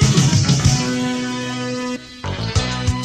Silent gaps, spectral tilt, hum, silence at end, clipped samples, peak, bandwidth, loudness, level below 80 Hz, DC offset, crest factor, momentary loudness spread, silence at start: none; -4.5 dB/octave; none; 0 s; under 0.1%; -2 dBFS; 13.5 kHz; -19 LUFS; -32 dBFS; under 0.1%; 16 dB; 11 LU; 0 s